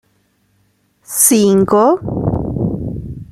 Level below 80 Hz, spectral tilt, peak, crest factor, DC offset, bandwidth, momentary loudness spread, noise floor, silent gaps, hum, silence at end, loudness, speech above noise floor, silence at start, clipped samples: -36 dBFS; -5 dB/octave; 0 dBFS; 16 dB; under 0.1%; 16 kHz; 14 LU; -59 dBFS; none; none; 0.05 s; -14 LUFS; 48 dB; 1.1 s; under 0.1%